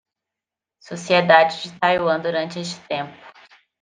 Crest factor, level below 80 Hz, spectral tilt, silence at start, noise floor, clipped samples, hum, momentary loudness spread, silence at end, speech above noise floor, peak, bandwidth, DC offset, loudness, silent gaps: 20 dB; -66 dBFS; -4.5 dB/octave; 0.9 s; -87 dBFS; under 0.1%; none; 18 LU; 0.5 s; 67 dB; -2 dBFS; 9.6 kHz; under 0.1%; -19 LUFS; none